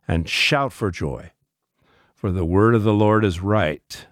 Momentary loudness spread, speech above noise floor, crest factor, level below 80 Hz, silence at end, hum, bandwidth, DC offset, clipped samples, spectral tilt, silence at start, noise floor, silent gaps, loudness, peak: 13 LU; 50 dB; 16 dB; -40 dBFS; 0.1 s; none; 15 kHz; under 0.1%; under 0.1%; -6 dB/octave; 0.1 s; -70 dBFS; none; -20 LUFS; -4 dBFS